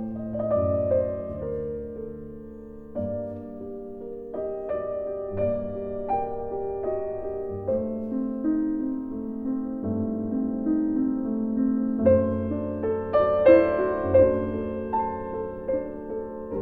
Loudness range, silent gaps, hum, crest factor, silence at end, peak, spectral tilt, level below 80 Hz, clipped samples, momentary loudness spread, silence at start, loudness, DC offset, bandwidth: 11 LU; none; none; 20 dB; 0 s; -4 dBFS; -11 dB/octave; -50 dBFS; under 0.1%; 15 LU; 0 s; -26 LUFS; under 0.1%; 4.6 kHz